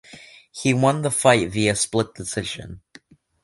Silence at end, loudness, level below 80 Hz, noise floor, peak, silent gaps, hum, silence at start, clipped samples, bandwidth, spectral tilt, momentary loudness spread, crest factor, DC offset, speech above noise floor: 0.65 s; -21 LUFS; -50 dBFS; -51 dBFS; -2 dBFS; none; none; 0.1 s; under 0.1%; 12 kHz; -4 dB/octave; 16 LU; 22 dB; under 0.1%; 30 dB